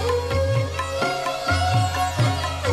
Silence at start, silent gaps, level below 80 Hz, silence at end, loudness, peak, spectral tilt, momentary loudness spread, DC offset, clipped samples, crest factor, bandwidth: 0 s; none; -38 dBFS; 0 s; -22 LUFS; -8 dBFS; -5 dB/octave; 4 LU; under 0.1%; under 0.1%; 12 dB; 14 kHz